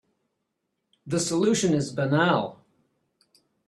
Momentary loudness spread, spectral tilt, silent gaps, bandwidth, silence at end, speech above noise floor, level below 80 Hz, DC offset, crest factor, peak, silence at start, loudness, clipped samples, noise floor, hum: 7 LU; -5 dB/octave; none; 13 kHz; 1.15 s; 56 dB; -64 dBFS; under 0.1%; 20 dB; -8 dBFS; 1.05 s; -24 LUFS; under 0.1%; -79 dBFS; none